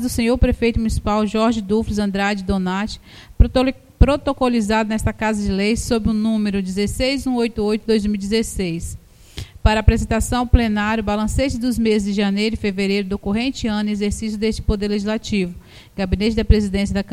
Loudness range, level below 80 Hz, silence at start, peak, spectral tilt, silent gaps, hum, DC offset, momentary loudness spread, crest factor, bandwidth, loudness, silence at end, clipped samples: 2 LU; -26 dBFS; 0 s; 0 dBFS; -6 dB/octave; none; none; under 0.1%; 6 LU; 18 dB; 15 kHz; -19 LUFS; 0 s; under 0.1%